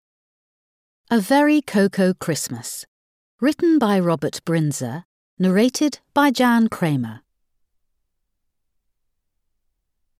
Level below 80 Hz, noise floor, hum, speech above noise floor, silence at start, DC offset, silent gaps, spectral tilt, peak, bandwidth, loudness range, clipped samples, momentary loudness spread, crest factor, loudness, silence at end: -66 dBFS; -73 dBFS; none; 55 dB; 1.1 s; under 0.1%; 2.87-3.38 s, 5.05-5.37 s; -5.5 dB/octave; -4 dBFS; 15.5 kHz; 5 LU; under 0.1%; 12 LU; 16 dB; -19 LUFS; 3 s